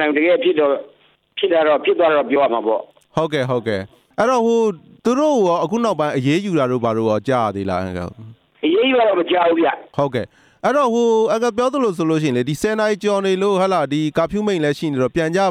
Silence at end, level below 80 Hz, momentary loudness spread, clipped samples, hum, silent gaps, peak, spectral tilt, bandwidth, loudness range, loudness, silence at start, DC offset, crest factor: 0 s; -54 dBFS; 8 LU; under 0.1%; none; none; -4 dBFS; -6 dB/octave; 15 kHz; 2 LU; -18 LUFS; 0 s; under 0.1%; 14 dB